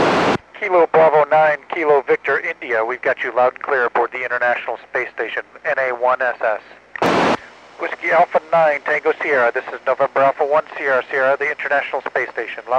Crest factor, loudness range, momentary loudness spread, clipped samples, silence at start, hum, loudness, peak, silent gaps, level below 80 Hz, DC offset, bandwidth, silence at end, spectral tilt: 14 dB; 4 LU; 9 LU; under 0.1%; 0 s; none; -18 LUFS; -4 dBFS; none; -60 dBFS; under 0.1%; 10 kHz; 0 s; -5 dB/octave